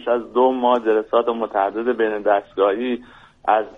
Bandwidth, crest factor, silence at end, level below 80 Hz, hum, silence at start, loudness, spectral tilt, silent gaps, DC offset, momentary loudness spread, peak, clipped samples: 4.7 kHz; 16 dB; 0.05 s; -58 dBFS; none; 0 s; -20 LUFS; -6.5 dB/octave; none; under 0.1%; 6 LU; -4 dBFS; under 0.1%